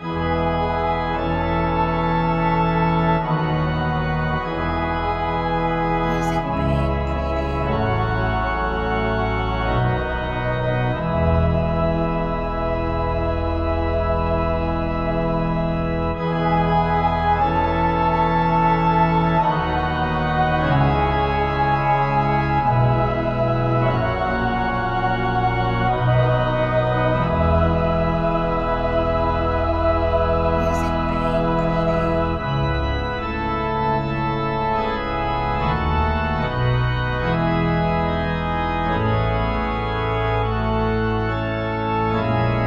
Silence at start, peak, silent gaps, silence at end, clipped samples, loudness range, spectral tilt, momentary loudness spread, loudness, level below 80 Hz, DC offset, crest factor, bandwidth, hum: 0 s; -6 dBFS; none; 0 s; under 0.1%; 3 LU; -8 dB/octave; 4 LU; -20 LUFS; -30 dBFS; under 0.1%; 14 dB; 7.4 kHz; none